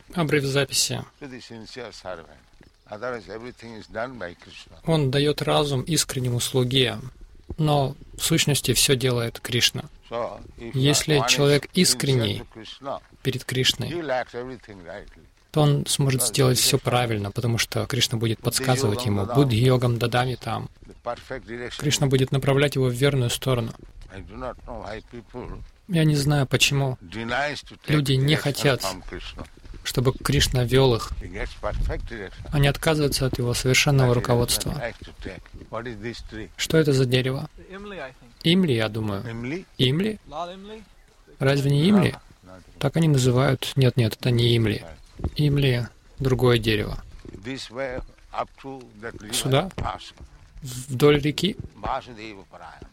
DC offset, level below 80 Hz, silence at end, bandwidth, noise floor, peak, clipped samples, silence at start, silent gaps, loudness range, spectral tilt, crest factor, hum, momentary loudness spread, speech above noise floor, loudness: under 0.1%; -42 dBFS; 0.05 s; 16.5 kHz; -47 dBFS; -4 dBFS; under 0.1%; 0.1 s; none; 6 LU; -4.5 dB/octave; 20 dB; none; 19 LU; 24 dB; -23 LUFS